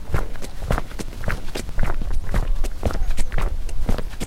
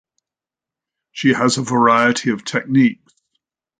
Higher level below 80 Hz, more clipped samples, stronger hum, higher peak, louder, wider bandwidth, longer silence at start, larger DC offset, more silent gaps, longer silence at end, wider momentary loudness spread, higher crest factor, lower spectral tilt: first, -22 dBFS vs -62 dBFS; neither; neither; about the same, -4 dBFS vs -2 dBFS; second, -28 LUFS vs -16 LUFS; first, 12.5 kHz vs 9.6 kHz; second, 0 s vs 1.15 s; neither; neither; second, 0 s vs 0.85 s; second, 4 LU vs 7 LU; about the same, 14 dB vs 18 dB; about the same, -5.5 dB/octave vs -4.5 dB/octave